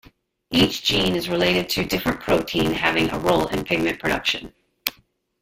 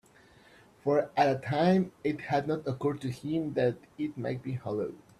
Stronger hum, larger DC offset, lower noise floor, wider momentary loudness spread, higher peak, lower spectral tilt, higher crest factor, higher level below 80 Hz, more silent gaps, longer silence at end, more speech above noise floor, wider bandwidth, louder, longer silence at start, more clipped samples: neither; neither; about the same, -58 dBFS vs -59 dBFS; second, 7 LU vs 10 LU; first, 0 dBFS vs -12 dBFS; second, -4.5 dB/octave vs -7.5 dB/octave; about the same, 22 dB vs 18 dB; first, -44 dBFS vs -66 dBFS; neither; first, 0.5 s vs 0.2 s; first, 37 dB vs 29 dB; first, 16.5 kHz vs 12.5 kHz; first, -21 LUFS vs -31 LUFS; second, 0.5 s vs 0.85 s; neither